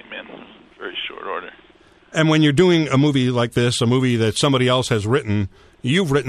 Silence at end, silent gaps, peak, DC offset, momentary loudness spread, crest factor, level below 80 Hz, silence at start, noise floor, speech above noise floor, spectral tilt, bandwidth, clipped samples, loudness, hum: 0 s; none; -4 dBFS; under 0.1%; 15 LU; 16 dB; -50 dBFS; 0.1 s; -51 dBFS; 34 dB; -5.5 dB/octave; 13.5 kHz; under 0.1%; -18 LUFS; none